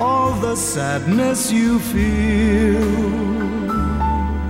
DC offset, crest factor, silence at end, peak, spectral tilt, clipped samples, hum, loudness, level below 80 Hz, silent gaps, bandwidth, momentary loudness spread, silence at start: under 0.1%; 12 dB; 0 s; -6 dBFS; -5.5 dB/octave; under 0.1%; none; -18 LUFS; -26 dBFS; none; 16.5 kHz; 4 LU; 0 s